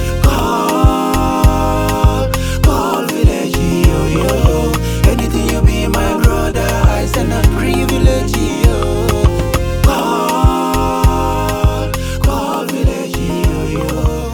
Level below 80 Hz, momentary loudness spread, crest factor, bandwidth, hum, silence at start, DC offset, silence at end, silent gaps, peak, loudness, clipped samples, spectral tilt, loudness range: -16 dBFS; 4 LU; 12 dB; over 20 kHz; none; 0 s; under 0.1%; 0 s; none; 0 dBFS; -14 LUFS; under 0.1%; -6 dB/octave; 1 LU